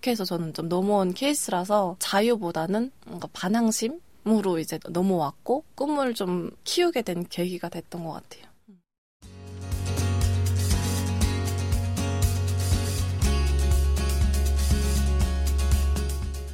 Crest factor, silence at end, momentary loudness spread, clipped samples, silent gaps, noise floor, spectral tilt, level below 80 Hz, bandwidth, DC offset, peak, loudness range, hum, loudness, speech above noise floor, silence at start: 16 dB; 0 s; 8 LU; under 0.1%; 8.98-9.20 s; -56 dBFS; -5.5 dB/octave; -30 dBFS; 16.5 kHz; under 0.1%; -10 dBFS; 5 LU; none; -26 LUFS; 30 dB; 0.05 s